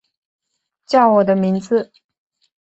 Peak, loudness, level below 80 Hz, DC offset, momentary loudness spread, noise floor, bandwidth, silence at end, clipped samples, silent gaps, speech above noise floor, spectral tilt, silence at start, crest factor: -2 dBFS; -16 LUFS; -64 dBFS; under 0.1%; 8 LU; -65 dBFS; 8 kHz; 0.85 s; under 0.1%; none; 50 dB; -7.5 dB/octave; 0.9 s; 18 dB